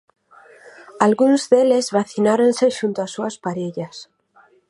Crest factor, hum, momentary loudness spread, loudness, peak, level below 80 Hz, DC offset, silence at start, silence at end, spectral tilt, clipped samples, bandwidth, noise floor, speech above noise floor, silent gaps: 18 dB; none; 13 LU; -18 LUFS; 0 dBFS; -68 dBFS; under 0.1%; 0.65 s; 0.65 s; -5 dB/octave; under 0.1%; 11.5 kHz; -55 dBFS; 37 dB; none